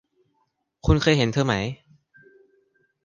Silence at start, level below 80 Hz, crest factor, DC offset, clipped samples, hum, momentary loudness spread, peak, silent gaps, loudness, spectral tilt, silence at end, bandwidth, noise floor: 0.85 s; -36 dBFS; 20 dB; under 0.1%; under 0.1%; none; 13 LU; -4 dBFS; none; -22 LUFS; -6 dB/octave; 1.3 s; 9.8 kHz; -72 dBFS